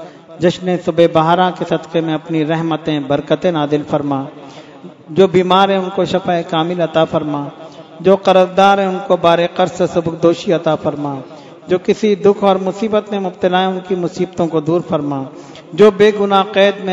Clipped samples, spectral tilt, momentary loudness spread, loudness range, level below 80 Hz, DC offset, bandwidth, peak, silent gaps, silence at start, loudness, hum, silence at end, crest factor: 0.2%; -6.5 dB/octave; 11 LU; 3 LU; -54 dBFS; under 0.1%; 7.8 kHz; 0 dBFS; none; 0 s; -14 LUFS; none; 0 s; 14 dB